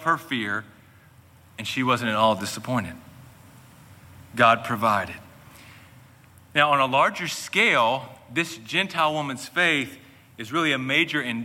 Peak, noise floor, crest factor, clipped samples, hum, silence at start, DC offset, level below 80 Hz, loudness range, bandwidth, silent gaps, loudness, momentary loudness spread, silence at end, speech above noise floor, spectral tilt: -4 dBFS; -53 dBFS; 22 dB; under 0.1%; none; 0 s; under 0.1%; -64 dBFS; 5 LU; 17 kHz; none; -23 LUFS; 15 LU; 0 s; 29 dB; -4 dB/octave